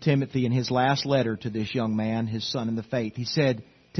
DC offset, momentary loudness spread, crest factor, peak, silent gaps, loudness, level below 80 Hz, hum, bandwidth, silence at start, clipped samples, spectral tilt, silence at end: under 0.1%; 6 LU; 18 dB; -8 dBFS; none; -26 LUFS; -62 dBFS; none; 6.4 kHz; 0 s; under 0.1%; -6.5 dB/octave; 0 s